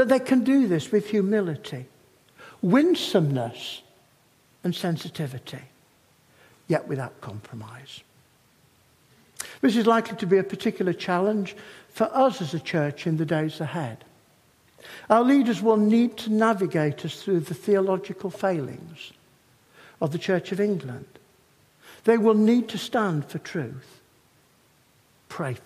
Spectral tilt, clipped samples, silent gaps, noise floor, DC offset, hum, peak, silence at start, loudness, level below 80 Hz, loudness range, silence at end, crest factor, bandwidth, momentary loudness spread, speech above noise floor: -6.5 dB/octave; under 0.1%; none; -61 dBFS; under 0.1%; none; -4 dBFS; 0 s; -24 LUFS; -70 dBFS; 10 LU; 0.05 s; 22 dB; 15 kHz; 20 LU; 37 dB